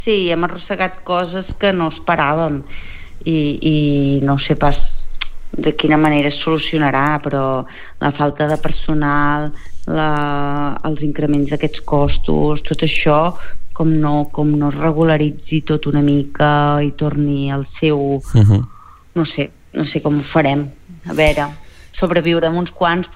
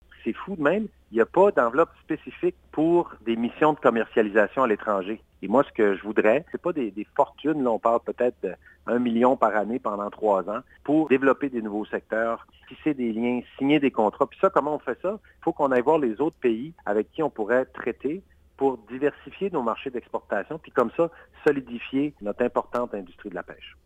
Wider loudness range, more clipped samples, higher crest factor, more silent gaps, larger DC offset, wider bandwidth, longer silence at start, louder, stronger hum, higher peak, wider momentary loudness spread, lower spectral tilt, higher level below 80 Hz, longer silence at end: about the same, 3 LU vs 4 LU; neither; second, 14 dB vs 22 dB; neither; neither; about the same, 9.8 kHz vs 9 kHz; second, 0 s vs 0.25 s; first, -17 LUFS vs -25 LUFS; neither; first, 0 dBFS vs -4 dBFS; about the same, 10 LU vs 11 LU; about the same, -8 dB/octave vs -7.5 dB/octave; first, -28 dBFS vs -60 dBFS; second, 0 s vs 0.15 s